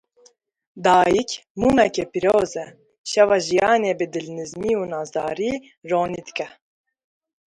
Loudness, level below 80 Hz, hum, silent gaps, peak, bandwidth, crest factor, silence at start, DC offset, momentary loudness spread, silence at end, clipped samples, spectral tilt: -21 LUFS; -52 dBFS; none; 1.50-1.55 s, 2.98-3.04 s; -2 dBFS; 11.5 kHz; 18 dB; 0.75 s; under 0.1%; 14 LU; 0.95 s; under 0.1%; -4.5 dB/octave